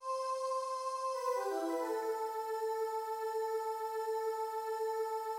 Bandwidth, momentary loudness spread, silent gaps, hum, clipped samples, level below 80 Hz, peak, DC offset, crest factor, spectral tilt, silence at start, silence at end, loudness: 16.5 kHz; 2 LU; none; none; under 0.1%; under -90 dBFS; -24 dBFS; under 0.1%; 12 dB; -1 dB/octave; 0 s; 0 s; -37 LUFS